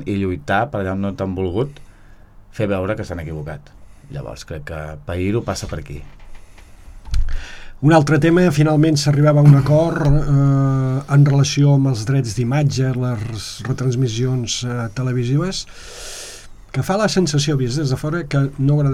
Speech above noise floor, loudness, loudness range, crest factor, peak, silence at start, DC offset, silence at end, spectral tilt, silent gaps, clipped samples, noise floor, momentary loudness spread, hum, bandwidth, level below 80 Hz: 26 dB; -18 LUFS; 13 LU; 18 dB; 0 dBFS; 0 s; under 0.1%; 0 s; -6.5 dB/octave; none; under 0.1%; -43 dBFS; 17 LU; none; 12 kHz; -32 dBFS